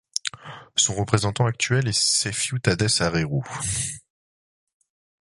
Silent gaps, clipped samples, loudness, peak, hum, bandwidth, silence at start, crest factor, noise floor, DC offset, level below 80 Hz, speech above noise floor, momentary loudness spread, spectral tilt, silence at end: none; under 0.1%; -22 LUFS; -2 dBFS; none; 11.5 kHz; 0.25 s; 22 dB; under -90 dBFS; under 0.1%; -48 dBFS; over 67 dB; 9 LU; -3 dB/octave; 1.2 s